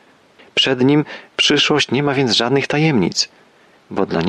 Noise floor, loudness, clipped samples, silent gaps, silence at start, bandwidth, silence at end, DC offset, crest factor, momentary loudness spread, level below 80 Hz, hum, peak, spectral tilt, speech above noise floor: -48 dBFS; -16 LUFS; under 0.1%; none; 0.55 s; 11 kHz; 0 s; under 0.1%; 14 dB; 9 LU; -54 dBFS; none; -4 dBFS; -4 dB/octave; 32 dB